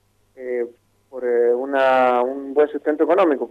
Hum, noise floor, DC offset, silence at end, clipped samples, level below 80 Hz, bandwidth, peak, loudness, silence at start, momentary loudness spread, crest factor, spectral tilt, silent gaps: none; -44 dBFS; under 0.1%; 0 s; under 0.1%; -70 dBFS; 5.4 kHz; -6 dBFS; -19 LUFS; 0.4 s; 12 LU; 14 dB; -6 dB/octave; none